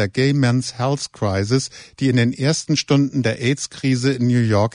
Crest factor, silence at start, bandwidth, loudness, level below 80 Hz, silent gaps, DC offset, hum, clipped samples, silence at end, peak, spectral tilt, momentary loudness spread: 16 dB; 0 s; 10 kHz; -19 LUFS; -54 dBFS; none; under 0.1%; none; under 0.1%; 0.05 s; -2 dBFS; -5.5 dB/octave; 5 LU